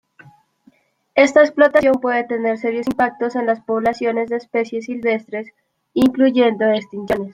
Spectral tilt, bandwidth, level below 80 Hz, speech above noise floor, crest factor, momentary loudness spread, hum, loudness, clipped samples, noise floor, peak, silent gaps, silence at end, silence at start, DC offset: -5.5 dB/octave; 15 kHz; -56 dBFS; 39 dB; 16 dB; 10 LU; none; -17 LUFS; under 0.1%; -56 dBFS; -2 dBFS; none; 0 s; 1.15 s; under 0.1%